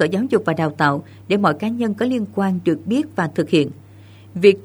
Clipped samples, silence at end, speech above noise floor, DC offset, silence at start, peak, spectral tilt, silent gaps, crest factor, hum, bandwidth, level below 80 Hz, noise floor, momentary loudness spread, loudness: under 0.1%; 0.05 s; 25 dB; under 0.1%; 0 s; 0 dBFS; -7 dB/octave; none; 18 dB; none; over 20 kHz; -62 dBFS; -43 dBFS; 5 LU; -19 LUFS